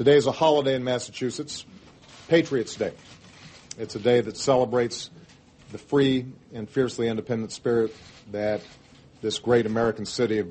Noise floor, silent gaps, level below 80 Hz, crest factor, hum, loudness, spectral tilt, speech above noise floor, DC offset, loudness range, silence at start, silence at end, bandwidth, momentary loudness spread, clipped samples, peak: -52 dBFS; none; -60 dBFS; 18 dB; none; -25 LUFS; -5 dB/octave; 28 dB; under 0.1%; 3 LU; 0 s; 0 s; 8.8 kHz; 15 LU; under 0.1%; -6 dBFS